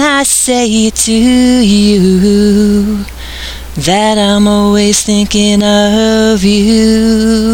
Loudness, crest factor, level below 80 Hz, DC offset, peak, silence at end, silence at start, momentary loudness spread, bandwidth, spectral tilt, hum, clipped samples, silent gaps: -8 LUFS; 8 dB; -28 dBFS; under 0.1%; 0 dBFS; 0 s; 0 s; 8 LU; 16.5 kHz; -4 dB/octave; none; under 0.1%; none